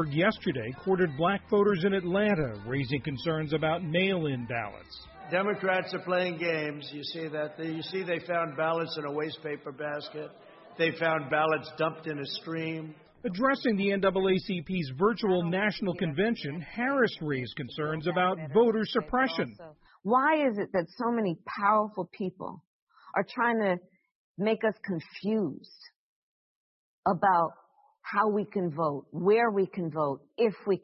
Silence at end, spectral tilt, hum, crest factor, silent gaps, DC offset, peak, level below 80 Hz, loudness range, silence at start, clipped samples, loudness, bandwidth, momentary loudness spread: 0.05 s; -9.5 dB/octave; none; 18 dB; 22.67-22.87 s, 24.15-24.35 s, 25.96-27.03 s; under 0.1%; -12 dBFS; -62 dBFS; 4 LU; 0 s; under 0.1%; -29 LUFS; 5.8 kHz; 11 LU